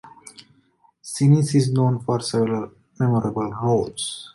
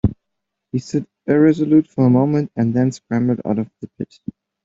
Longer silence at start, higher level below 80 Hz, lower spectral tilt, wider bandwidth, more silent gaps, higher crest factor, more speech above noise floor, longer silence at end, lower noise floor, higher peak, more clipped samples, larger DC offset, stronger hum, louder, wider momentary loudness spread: about the same, 0.05 s vs 0.05 s; second, -56 dBFS vs -44 dBFS; second, -6.5 dB/octave vs -8.5 dB/octave; first, 11.5 kHz vs 7.8 kHz; neither; about the same, 18 dB vs 16 dB; second, 40 dB vs 62 dB; second, 0.05 s vs 0.6 s; second, -60 dBFS vs -79 dBFS; about the same, -4 dBFS vs -2 dBFS; neither; neither; neither; second, -21 LUFS vs -18 LUFS; about the same, 14 LU vs 16 LU